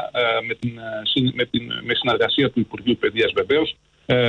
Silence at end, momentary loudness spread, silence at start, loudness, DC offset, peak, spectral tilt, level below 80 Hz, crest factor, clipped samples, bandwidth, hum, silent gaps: 0 s; 8 LU; 0 s; -21 LUFS; under 0.1%; -8 dBFS; -7 dB/octave; -52 dBFS; 14 dB; under 0.1%; 8.6 kHz; none; none